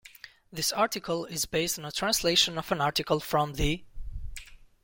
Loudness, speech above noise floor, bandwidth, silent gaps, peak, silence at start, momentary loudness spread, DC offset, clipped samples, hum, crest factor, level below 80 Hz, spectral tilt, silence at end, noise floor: -28 LUFS; 23 dB; 17 kHz; none; -10 dBFS; 0.05 s; 20 LU; under 0.1%; under 0.1%; none; 20 dB; -44 dBFS; -3 dB/octave; 0.25 s; -51 dBFS